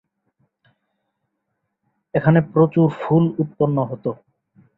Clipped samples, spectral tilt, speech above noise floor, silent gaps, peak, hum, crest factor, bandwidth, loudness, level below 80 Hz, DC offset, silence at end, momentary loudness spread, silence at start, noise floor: under 0.1%; -11.5 dB/octave; 58 dB; none; -2 dBFS; none; 18 dB; 4.1 kHz; -19 LUFS; -58 dBFS; under 0.1%; 0.65 s; 11 LU; 2.15 s; -76 dBFS